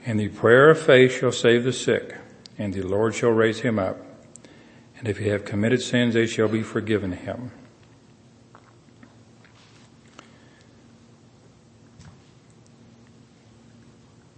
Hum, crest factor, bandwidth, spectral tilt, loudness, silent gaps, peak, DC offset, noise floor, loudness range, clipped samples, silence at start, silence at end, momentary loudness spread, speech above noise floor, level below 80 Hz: none; 22 dB; 8.8 kHz; -5.5 dB/octave; -21 LUFS; none; -2 dBFS; under 0.1%; -53 dBFS; 13 LU; under 0.1%; 0 s; 2.3 s; 19 LU; 32 dB; -64 dBFS